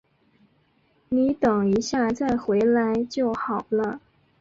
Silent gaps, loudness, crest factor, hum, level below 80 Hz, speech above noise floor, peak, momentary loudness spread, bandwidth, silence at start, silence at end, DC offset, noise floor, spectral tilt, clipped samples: none; -23 LUFS; 14 dB; none; -56 dBFS; 42 dB; -10 dBFS; 7 LU; 7.6 kHz; 1.1 s; 0.4 s; under 0.1%; -64 dBFS; -6 dB/octave; under 0.1%